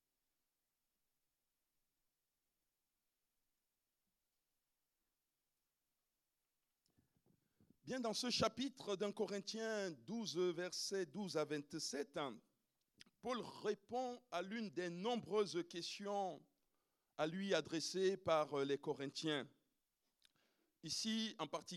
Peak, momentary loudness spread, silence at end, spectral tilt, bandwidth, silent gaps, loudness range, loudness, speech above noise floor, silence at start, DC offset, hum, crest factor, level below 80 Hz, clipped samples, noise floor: -24 dBFS; 8 LU; 0 s; -4 dB/octave; 14 kHz; none; 4 LU; -43 LUFS; over 47 dB; 7.85 s; under 0.1%; none; 24 dB; -88 dBFS; under 0.1%; under -90 dBFS